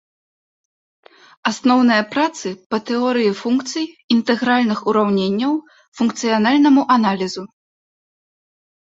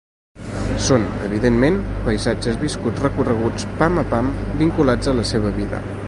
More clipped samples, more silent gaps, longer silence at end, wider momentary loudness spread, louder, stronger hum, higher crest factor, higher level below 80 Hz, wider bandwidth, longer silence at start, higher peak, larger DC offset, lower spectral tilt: neither; first, 2.66-2.70 s, 4.04-4.08 s, 5.88-5.92 s vs none; first, 1.35 s vs 0 s; first, 11 LU vs 7 LU; first, -17 LUFS vs -20 LUFS; neither; about the same, 18 dB vs 18 dB; second, -64 dBFS vs -30 dBFS; second, 8 kHz vs 11.5 kHz; first, 1.45 s vs 0.35 s; about the same, -2 dBFS vs 0 dBFS; neither; about the same, -5 dB/octave vs -6 dB/octave